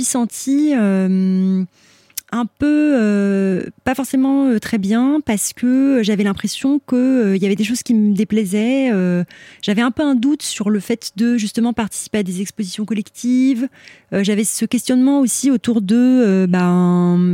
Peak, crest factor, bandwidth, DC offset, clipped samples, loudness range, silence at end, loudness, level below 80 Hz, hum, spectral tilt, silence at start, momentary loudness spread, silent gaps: -4 dBFS; 12 dB; 16.5 kHz; under 0.1%; under 0.1%; 4 LU; 0 s; -17 LUFS; -54 dBFS; none; -5.5 dB/octave; 0 s; 8 LU; none